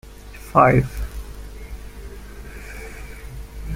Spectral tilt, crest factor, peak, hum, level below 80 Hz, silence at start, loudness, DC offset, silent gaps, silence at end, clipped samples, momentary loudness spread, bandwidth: -7.5 dB/octave; 22 dB; -2 dBFS; 50 Hz at -35 dBFS; -34 dBFS; 0.05 s; -18 LUFS; under 0.1%; none; 0 s; under 0.1%; 24 LU; 16.5 kHz